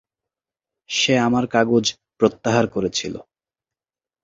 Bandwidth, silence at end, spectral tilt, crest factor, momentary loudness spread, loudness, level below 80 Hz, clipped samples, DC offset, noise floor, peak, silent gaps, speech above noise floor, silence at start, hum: 7.8 kHz; 1.05 s; -4 dB/octave; 20 dB; 8 LU; -20 LUFS; -56 dBFS; under 0.1%; under 0.1%; under -90 dBFS; -2 dBFS; none; over 71 dB; 0.9 s; none